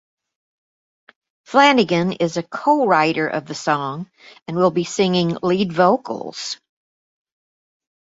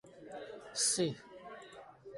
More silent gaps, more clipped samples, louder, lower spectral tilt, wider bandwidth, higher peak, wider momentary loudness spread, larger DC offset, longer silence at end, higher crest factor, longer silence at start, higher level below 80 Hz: first, 4.42-4.46 s vs none; neither; first, -18 LUFS vs -33 LUFS; first, -5 dB/octave vs -2.5 dB/octave; second, 8 kHz vs 12 kHz; first, -2 dBFS vs -20 dBFS; second, 14 LU vs 21 LU; neither; first, 1.55 s vs 0 s; about the same, 18 dB vs 20 dB; first, 1.5 s vs 0.05 s; first, -62 dBFS vs -76 dBFS